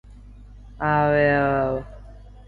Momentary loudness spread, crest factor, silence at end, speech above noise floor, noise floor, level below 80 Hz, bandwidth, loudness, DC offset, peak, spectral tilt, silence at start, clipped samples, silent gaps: 12 LU; 16 dB; 0.05 s; 23 dB; -43 dBFS; -42 dBFS; 4.9 kHz; -21 LUFS; under 0.1%; -8 dBFS; -9 dB/octave; 0.05 s; under 0.1%; none